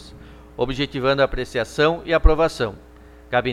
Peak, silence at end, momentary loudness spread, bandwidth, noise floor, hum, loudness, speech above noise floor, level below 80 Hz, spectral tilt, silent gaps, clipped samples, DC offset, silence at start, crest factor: 0 dBFS; 0 s; 9 LU; 12.5 kHz; -42 dBFS; none; -21 LUFS; 23 dB; -28 dBFS; -5.5 dB/octave; none; under 0.1%; under 0.1%; 0 s; 20 dB